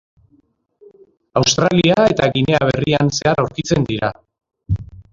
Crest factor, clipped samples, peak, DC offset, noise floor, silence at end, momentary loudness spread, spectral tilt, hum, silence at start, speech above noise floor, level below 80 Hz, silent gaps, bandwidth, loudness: 18 dB; under 0.1%; 0 dBFS; under 0.1%; -58 dBFS; 0.3 s; 11 LU; -5 dB/octave; none; 1.35 s; 43 dB; -40 dBFS; none; 7.6 kHz; -16 LUFS